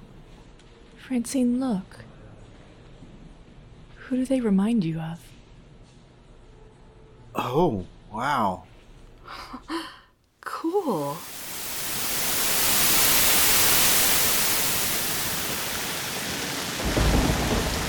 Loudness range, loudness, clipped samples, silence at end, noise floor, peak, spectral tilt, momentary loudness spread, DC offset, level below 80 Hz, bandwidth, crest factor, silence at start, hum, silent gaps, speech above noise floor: 13 LU; -22 LUFS; under 0.1%; 0 s; -54 dBFS; -6 dBFS; -2.5 dB/octave; 18 LU; under 0.1%; -40 dBFS; over 20 kHz; 20 dB; 0 s; none; none; 29 dB